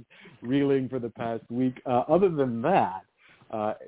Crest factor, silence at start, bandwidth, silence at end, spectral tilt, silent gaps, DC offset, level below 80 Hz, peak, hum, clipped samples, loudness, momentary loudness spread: 18 dB; 0.25 s; 4 kHz; 0 s; -11 dB/octave; none; under 0.1%; -62 dBFS; -8 dBFS; none; under 0.1%; -27 LUFS; 11 LU